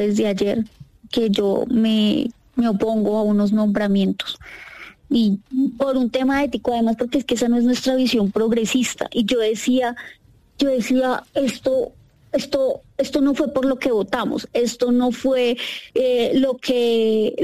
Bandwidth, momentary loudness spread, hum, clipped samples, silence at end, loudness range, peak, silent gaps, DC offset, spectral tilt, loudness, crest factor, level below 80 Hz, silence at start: 15 kHz; 8 LU; none; under 0.1%; 0 s; 2 LU; -8 dBFS; none; under 0.1%; -5 dB/octave; -20 LUFS; 10 dB; -52 dBFS; 0 s